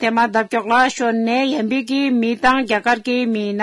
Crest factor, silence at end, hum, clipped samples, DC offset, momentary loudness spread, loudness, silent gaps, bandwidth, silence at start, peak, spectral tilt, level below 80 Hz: 14 dB; 0 s; none; under 0.1%; under 0.1%; 4 LU; -17 LUFS; none; 12 kHz; 0 s; -2 dBFS; -4.5 dB/octave; -52 dBFS